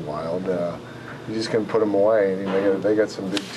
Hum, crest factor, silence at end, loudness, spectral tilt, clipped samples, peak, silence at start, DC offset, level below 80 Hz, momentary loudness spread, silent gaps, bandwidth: none; 16 dB; 0 s; -22 LUFS; -6 dB/octave; under 0.1%; -8 dBFS; 0 s; under 0.1%; -60 dBFS; 12 LU; none; 12.5 kHz